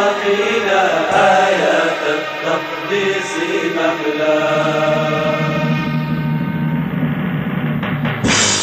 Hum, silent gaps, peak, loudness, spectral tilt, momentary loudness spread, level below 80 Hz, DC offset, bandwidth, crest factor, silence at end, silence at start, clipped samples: none; none; 0 dBFS; -16 LUFS; -4.5 dB/octave; 7 LU; -46 dBFS; under 0.1%; 14 kHz; 16 dB; 0 s; 0 s; under 0.1%